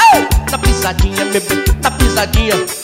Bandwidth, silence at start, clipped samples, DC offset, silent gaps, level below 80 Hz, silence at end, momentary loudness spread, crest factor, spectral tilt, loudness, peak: 16.5 kHz; 0 s; under 0.1%; under 0.1%; none; -18 dBFS; 0 s; 3 LU; 10 dB; -4 dB/octave; -13 LUFS; -2 dBFS